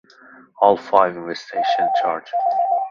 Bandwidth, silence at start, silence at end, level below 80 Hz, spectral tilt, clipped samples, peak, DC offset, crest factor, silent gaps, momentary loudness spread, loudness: 7.2 kHz; 0.6 s; 0 s; -66 dBFS; -5 dB/octave; under 0.1%; 0 dBFS; under 0.1%; 20 dB; none; 6 LU; -19 LUFS